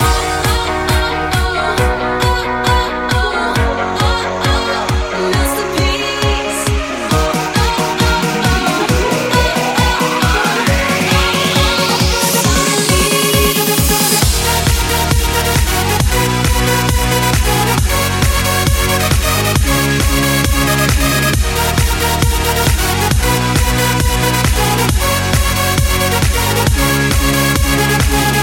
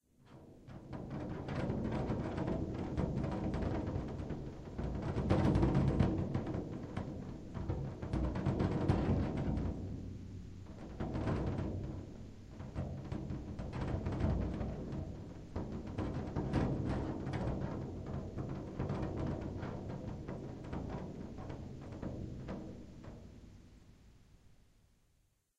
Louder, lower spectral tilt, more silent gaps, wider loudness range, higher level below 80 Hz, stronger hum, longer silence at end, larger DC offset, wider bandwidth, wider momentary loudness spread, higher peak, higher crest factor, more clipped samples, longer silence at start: first, -13 LUFS vs -39 LUFS; second, -4 dB/octave vs -8.5 dB/octave; neither; second, 3 LU vs 10 LU; first, -20 dBFS vs -48 dBFS; neither; second, 0 s vs 1.1 s; neither; first, 17 kHz vs 9.2 kHz; second, 3 LU vs 15 LU; first, 0 dBFS vs -16 dBFS; second, 14 dB vs 22 dB; neither; second, 0 s vs 0.25 s